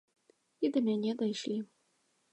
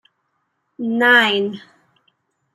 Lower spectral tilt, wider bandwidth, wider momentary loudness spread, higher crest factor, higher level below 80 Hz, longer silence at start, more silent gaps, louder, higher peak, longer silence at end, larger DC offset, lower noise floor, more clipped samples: first, -6 dB/octave vs -4 dB/octave; second, 8.8 kHz vs 13.5 kHz; second, 8 LU vs 16 LU; about the same, 16 dB vs 20 dB; second, -88 dBFS vs -72 dBFS; second, 0.6 s vs 0.8 s; neither; second, -34 LUFS vs -16 LUFS; second, -18 dBFS vs -2 dBFS; second, 0.7 s vs 0.95 s; neither; first, -75 dBFS vs -71 dBFS; neither